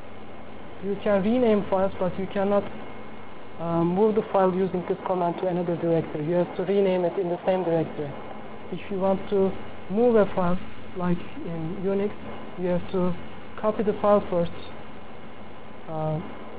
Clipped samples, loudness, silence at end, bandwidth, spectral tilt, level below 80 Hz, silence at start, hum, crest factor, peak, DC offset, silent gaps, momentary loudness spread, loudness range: under 0.1%; -25 LUFS; 0 s; 4 kHz; -11.5 dB/octave; -52 dBFS; 0 s; none; 18 dB; -8 dBFS; 2%; none; 20 LU; 3 LU